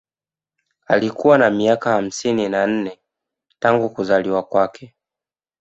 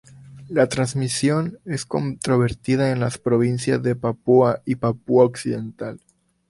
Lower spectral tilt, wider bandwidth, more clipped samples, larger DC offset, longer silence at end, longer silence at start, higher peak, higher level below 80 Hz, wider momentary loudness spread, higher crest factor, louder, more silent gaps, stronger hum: about the same, -5.5 dB/octave vs -6 dB/octave; second, 8.2 kHz vs 11.5 kHz; neither; neither; first, 0.75 s vs 0.55 s; first, 0.9 s vs 0.25 s; about the same, -2 dBFS vs -4 dBFS; second, -60 dBFS vs -52 dBFS; second, 7 LU vs 10 LU; about the same, 18 dB vs 18 dB; first, -18 LUFS vs -21 LUFS; neither; neither